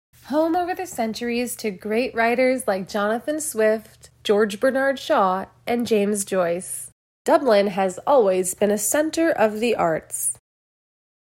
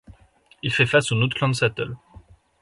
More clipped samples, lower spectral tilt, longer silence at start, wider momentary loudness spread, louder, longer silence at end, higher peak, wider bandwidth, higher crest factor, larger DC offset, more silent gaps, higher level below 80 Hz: neither; second, -3.5 dB/octave vs -5 dB/octave; first, 0.25 s vs 0.1 s; second, 8 LU vs 13 LU; about the same, -22 LUFS vs -22 LUFS; first, 1.05 s vs 0.65 s; about the same, -4 dBFS vs -4 dBFS; first, 16.5 kHz vs 11.5 kHz; about the same, 16 dB vs 20 dB; neither; first, 6.92-7.25 s vs none; second, -60 dBFS vs -52 dBFS